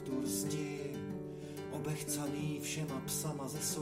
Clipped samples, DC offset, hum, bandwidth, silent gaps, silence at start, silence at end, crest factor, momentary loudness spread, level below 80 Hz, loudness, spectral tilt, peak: under 0.1%; under 0.1%; none; 16 kHz; none; 0 s; 0 s; 14 dB; 7 LU; -68 dBFS; -39 LUFS; -4.5 dB/octave; -26 dBFS